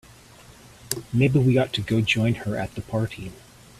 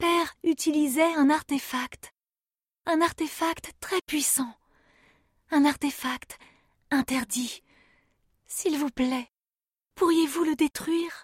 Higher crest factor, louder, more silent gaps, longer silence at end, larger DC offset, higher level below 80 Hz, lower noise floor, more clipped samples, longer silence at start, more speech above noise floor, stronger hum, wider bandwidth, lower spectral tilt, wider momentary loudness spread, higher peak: about the same, 20 dB vs 18 dB; first, -23 LUFS vs -27 LUFS; neither; first, 0.45 s vs 0 s; neither; first, -50 dBFS vs -62 dBFS; second, -49 dBFS vs under -90 dBFS; neither; first, 0.5 s vs 0 s; second, 26 dB vs over 64 dB; neither; second, 14.5 kHz vs 16 kHz; first, -6 dB/octave vs -2.5 dB/octave; about the same, 12 LU vs 13 LU; first, -6 dBFS vs -10 dBFS